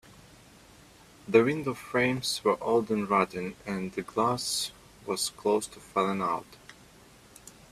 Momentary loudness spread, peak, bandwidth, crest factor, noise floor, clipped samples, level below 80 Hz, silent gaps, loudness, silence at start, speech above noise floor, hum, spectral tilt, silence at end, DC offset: 11 LU; -8 dBFS; 14.5 kHz; 22 dB; -55 dBFS; under 0.1%; -62 dBFS; none; -29 LUFS; 1.25 s; 27 dB; none; -4 dB/octave; 0.2 s; under 0.1%